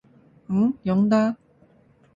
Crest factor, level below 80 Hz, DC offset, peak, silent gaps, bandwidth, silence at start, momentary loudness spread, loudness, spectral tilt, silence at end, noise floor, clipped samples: 16 dB; -60 dBFS; under 0.1%; -8 dBFS; none; 7.4 kHz; 0.5 s; 8 LU; -22 LUFS; -8.5 dB/octave; 0.8 s; -57 dBFS; under 0.1%